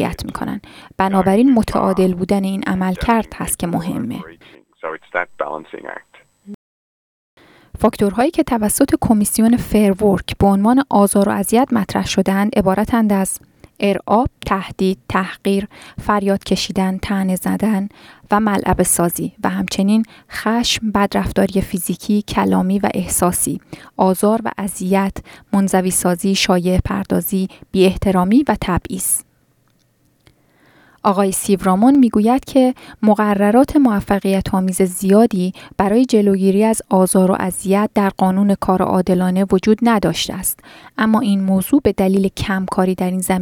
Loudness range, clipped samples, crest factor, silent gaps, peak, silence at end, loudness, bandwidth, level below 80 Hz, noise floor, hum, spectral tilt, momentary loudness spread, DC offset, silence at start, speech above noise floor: 6 LU; under 0.1%; 16 dB; 6.54-7.37 s; 0 dBFS; 0 s; -16 LUFS; 19 kHz; -38 dBFS; -59 dBFS; none; -5.5 dB/octave; 9 LU; under 0.1%; 0 s; 43 dB